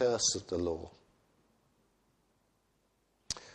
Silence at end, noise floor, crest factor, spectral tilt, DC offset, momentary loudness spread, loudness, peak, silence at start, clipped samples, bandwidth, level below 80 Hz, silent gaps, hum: 0 s; -75 dBFS; 22 dB; -2.5 dB/octave; under 0.1%; 13 LU; -34 LUFS; -18 dBFS; 0 s; under 0.1%; 11 kHz; -62 dBFS; none; none